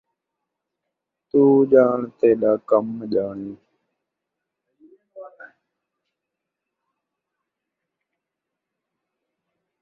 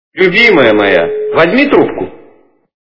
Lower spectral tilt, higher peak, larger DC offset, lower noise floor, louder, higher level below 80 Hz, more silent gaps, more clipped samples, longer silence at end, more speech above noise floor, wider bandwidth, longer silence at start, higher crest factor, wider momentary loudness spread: first, -10.5 dB/octave vs -6.5 dB/octave; about the same, -2 dBFS vs 0 dBFS; second, under 0.1% vs 1%; first, -84 dBFS vs -45 dBFS; second, -19 LUFS vs -8 LUFS; second, -68 dBFS vs -44 dBFS; neither; second, under 0.1% vs 1%; first, 4.35 s vs 0.65 s; first, 66 dB vs 37 dB; second, 4.5 kHz vs 6 kHz; first, 1.35 s vs 0.15 s; first, 22 dB vs 10 dB; first, 13 LU vs 10 LU